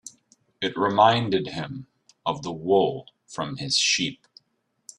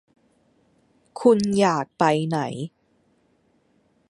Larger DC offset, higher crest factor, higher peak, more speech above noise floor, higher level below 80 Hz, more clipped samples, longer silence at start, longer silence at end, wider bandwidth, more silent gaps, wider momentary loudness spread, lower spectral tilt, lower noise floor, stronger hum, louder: neither; about the same, 22 dB vs 22 dB; about the same, -4 dBFS vs -4 dBFS; first, 49 dB vs 44 dB; about the same, -64 dBFS vs -64 dBFS; neither; second, 0.05 s vs 1.15 s; second, 0.85 s vs 1.45 s; about the same, 11.5 kHz vs 11.5 kHz; neither; about the same, 18 LU vs 16 LU; second, -3.5 dB/octave vs -6 dB/octave; first, -73 dBFS vs -64 dBFS; neither; about the same, -24 LUFS vs -22 LUFS